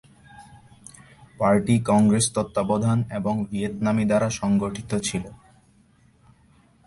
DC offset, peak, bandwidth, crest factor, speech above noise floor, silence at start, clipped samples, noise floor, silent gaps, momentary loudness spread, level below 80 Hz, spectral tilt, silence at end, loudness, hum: under 0.1%; -8 dBFS; 11.5 kHz; 16 dB; 36 dB; 0.4 s; under 0.1%; -58 dBFS; none; 9 LU; -52 dBFS; -6 dB/octave; 1.5 s; -23 LUFS; none